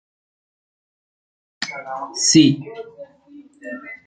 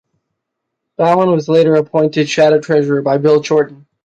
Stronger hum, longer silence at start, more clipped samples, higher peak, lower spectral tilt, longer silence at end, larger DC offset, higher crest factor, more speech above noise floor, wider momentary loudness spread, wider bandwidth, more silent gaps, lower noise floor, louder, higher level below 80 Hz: neither; first, 1.6 s vs 1 s; neither; about the same, -2 dBFS vs -2 dBFS; second, -3.5 dB/octave vs -6.5 dB/octave; second, 0.1 s vs 0.45 s; neither; first, 22 dB vs 12 dB; second, 28 dB vs 64 dB; first, 24 LU vs 4 LU; first, 9.4 kHz vs 8 kHz; neither; second, -46 dBFS vs -76 dBFS; second, -18 LUFS vs -13 LUFS; about the same, -64 dBFS vs -60 dBFS